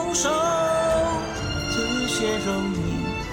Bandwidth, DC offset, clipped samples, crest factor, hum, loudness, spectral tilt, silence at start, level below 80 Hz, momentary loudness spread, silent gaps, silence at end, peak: 17 kHz; under 0.1%; under 0.1%; 14 dB; none; -23 LUFS; -4 dB/octave; 0 s; -40 dBFS; 6 LU; none; 0 s; -10 dBFS